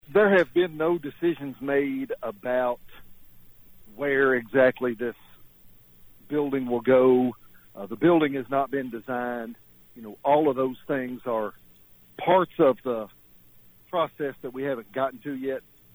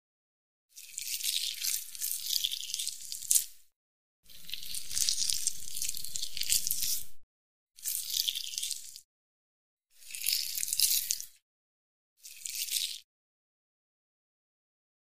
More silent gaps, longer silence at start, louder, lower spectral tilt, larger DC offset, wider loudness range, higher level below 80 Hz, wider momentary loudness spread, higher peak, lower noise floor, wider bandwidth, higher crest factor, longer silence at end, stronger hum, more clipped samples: second, none vs 3.76-4.23 s, 7.23-7.67 s, 9.04-9.77 s, 11.42-12.16 s; second, 0.1 s vs 0.7 s; first, -25 LUFS vs -31 LUFS; first, -8 dB/octave vs 3.5 dB/octave; neither; about the same, 4 LU vs 5 LU; about the same, -62 dBFS vs -64 dBFS; second, 13 LU vs 16 LU; second, -10 dBFS vs -2 dBFS; second, -55 dBFS vs under -90 dBFS; first, over 20 kHz vs 15.5 kHz; second, 16 dB vs 34 dB; second, 0.35 s vs 2.1 s; neither; neither